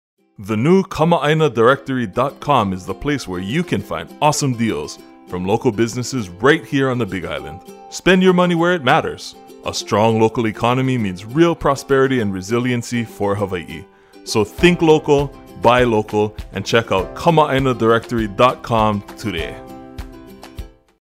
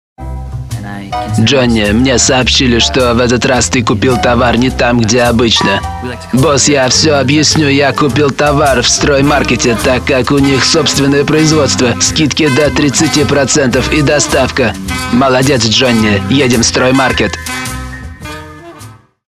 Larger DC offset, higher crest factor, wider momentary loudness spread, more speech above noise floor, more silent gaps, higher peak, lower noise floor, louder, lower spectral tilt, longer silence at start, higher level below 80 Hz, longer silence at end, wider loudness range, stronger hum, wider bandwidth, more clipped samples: neither; first, 18 dB vs 10 dB; first, 17 LU vs 12 LU; second, 21 dB vs 25 dB; neither; about the same, 0 dBFS vs 0 dBFS; first, -38 dBFS vs -34 dBFS; second, -17 LUFS vs -9 LUFS; first, -5.5 dB/octave vs -4 dB/octave; first, 0.4 s vs 0.2 s; second, -40 dBFS vs -26 dBFS; about the same, 0.35 s vs 0.35 s; first, 4 LU vs 1 LU; neither; about the same, 16 kHz vs 16 kHz; neither